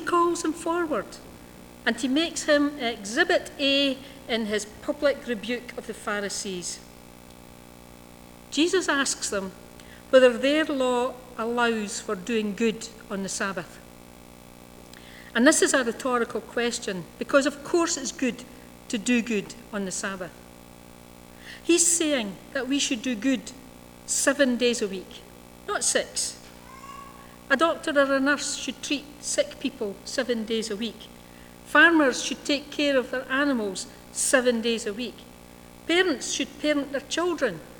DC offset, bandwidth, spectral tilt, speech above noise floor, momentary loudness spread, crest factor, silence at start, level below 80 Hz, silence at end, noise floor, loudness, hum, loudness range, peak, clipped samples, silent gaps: under 0.1%; over 20 kHz; -2.5 dB/octave; 22 dB; 19 LU; 22 dB; 0 s; -56 dBFS; 0 s; -47 dBFS; -25 LUFS; 60 Hz at -55 dBFS; 6 LU; -4 dBFS; under 0.1%; none